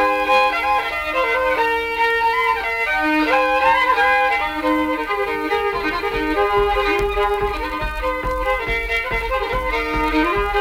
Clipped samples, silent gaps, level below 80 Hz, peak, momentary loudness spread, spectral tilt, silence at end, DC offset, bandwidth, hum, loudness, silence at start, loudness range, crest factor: under 0.1%; none; -34 dBFS; -4 dBFS; 6 LU; -4.5 dB/octave; 0 s; under 0.1%; 16.5 kHz; none; -18 LUFS; 0 s; 4 LU; 14 dB